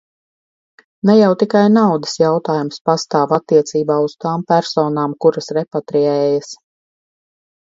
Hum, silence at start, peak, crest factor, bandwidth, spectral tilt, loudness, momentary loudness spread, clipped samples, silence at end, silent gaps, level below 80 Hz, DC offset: none; 1.05 s; 0 dBFS; 16 dB; 7.8 kHz; -6 dB/octave; -15 LUFS; 9 LU; under 0.1%; 1.2 s; 2.81-2.85 s; -64 dBFS; under 0.1%